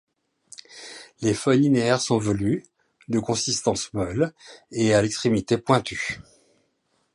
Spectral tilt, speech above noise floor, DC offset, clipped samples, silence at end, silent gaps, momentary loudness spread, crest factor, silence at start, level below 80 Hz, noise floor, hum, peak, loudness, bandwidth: -5 dB/octave; 48 dB; under 0.1%; under 0.1%; 0.95 s; none; 20 LU; 20 dB; 0.7 s; -52 dBFS; -70 dBFS; none; -4 dBFS; -23 LUFS; 11.5 kHz